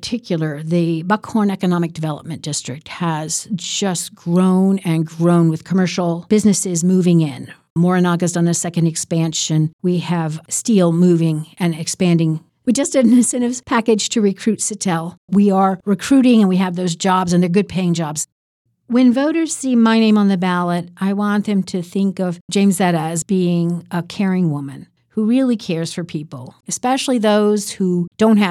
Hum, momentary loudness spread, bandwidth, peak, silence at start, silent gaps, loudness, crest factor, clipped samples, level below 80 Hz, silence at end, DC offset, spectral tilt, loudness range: none; 10 LU; 13.5 kHz; -4 dBFS; 0 s; 7.70-7.76 s, 9.73-9.79 s, 15.17-15.28 s, 18.32-18.65 s, 22.41-22.48 s; -17 LUFS; 12 dB; under 0.1%; -60 dBFS; 0 s; under 0.1%; -5.5 dB/octave; 4 LU